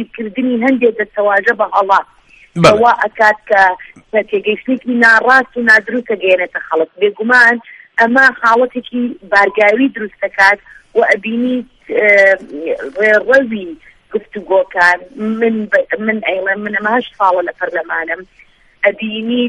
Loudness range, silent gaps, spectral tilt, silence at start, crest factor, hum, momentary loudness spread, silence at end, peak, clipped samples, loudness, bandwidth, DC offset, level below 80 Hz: 4 LU; none; -5 dB/octave; 0 s; 14 dB; none; 12 LU; 0 s; 0 dBFS; 0.1%; -12 LUFS; 11.5 kHz; under 0.1%; -52 dBFS